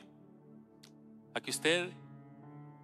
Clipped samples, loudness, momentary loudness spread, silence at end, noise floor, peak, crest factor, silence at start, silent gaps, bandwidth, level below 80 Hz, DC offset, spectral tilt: under 0.1%; -34 LUFS; 27 LU; 0 s; -58 dBFS; -14 dBFS; 26 dB; 0 s; none; 15 kHz; -88 dBFS; under 0.1%; -3 dB/octave